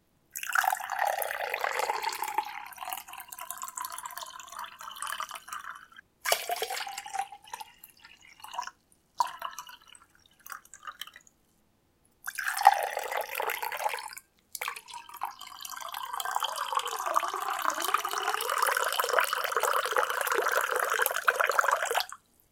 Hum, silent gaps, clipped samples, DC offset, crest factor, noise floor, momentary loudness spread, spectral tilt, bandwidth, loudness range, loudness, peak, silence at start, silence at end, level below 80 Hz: none; none; under 0.1%; under 0.1%; 30 dB; -69 dBFS; 17 LU; 1.5 dB/octave; 17 kHz; 12 LU; -31 LUFS; -4 dBFS; 0.35 s; 0.35 s; -76 dBFS